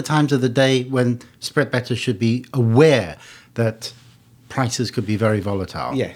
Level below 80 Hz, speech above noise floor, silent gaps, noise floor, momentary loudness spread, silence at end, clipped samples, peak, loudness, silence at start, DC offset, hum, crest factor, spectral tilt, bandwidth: -54 dBFS; 25 dB; none; -44 dBFS; 14 LU; 0 s; under 0.1%; -2 dBFS; -20 LUFS; 0 s; under 0.1%; none; 18 dB; -6 dB/octave; 15 kHz